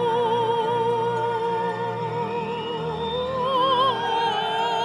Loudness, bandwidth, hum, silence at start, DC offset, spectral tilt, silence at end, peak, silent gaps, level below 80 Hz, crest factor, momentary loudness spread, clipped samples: -24 LUFS; 11.5 kHz; none; 0 s; under 0.1%; -5.5 dB/octave; 0 s; -10 dBFS; none; -56 dBFS; 14 dB; 7 LU; under 0.1%